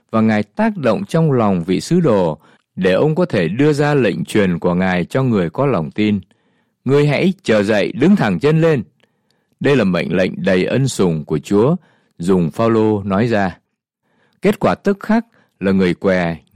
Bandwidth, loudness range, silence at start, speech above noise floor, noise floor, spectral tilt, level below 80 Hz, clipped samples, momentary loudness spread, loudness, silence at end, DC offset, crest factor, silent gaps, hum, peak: 13.5 kHz; 2 LU; 0.1 s; 55 dB; -70 dBFS; -7 dB/octave; -50 dBFS; under 0.1%; 5 LU; -16 LUFS; 0.15 s; 0.1%; 14 dB; none; none; -2 dBFS